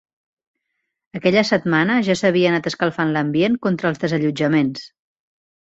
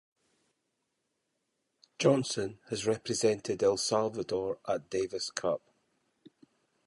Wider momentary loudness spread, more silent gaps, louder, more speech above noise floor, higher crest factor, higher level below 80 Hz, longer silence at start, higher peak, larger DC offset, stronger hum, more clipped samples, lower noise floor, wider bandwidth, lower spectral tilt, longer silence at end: about the same, 6 LU vs 7 LU; neither; first, -18 LUFS vs -31 LUFS; first, 58 dB vs 51 dB; about the same, 18 dB vs 20 dB; first, -60 dBFS vs -68 dBFS; second, 1.15 s vs 2 s; first, -2 dBFS vs -12 dBFS; neither; neither; neither; second, -76 dBFS vs -81 dBFS; second, 8 kHz vs 11.5 kHz; first, -6 dB/octave vs -4 dB/octave; second, 0.75 s vs 1.3 s